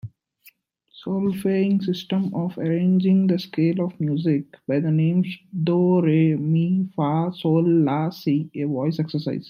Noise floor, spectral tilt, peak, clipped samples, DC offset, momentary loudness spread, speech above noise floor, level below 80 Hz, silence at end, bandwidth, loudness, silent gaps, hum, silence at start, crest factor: -56 dBFS; -9 dB/octave; -8 dBFS; under 0.1%; under 0.1%; 8 LU; 35 dB; -68 dBFS; 0 s; 14 kHz; -22 LUFS; none; none; 0.05 s; 14 dB